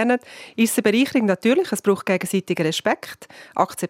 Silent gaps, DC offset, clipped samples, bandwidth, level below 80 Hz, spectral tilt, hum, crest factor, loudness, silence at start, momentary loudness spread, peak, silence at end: none; under 0.1%; under 0.1%; 16.5 kHz; -70 dBFS; -4.5 dB/octave; none; 18 dB; -21 LUFS; 0 s; 11 LU; -4 dBFS; 0 s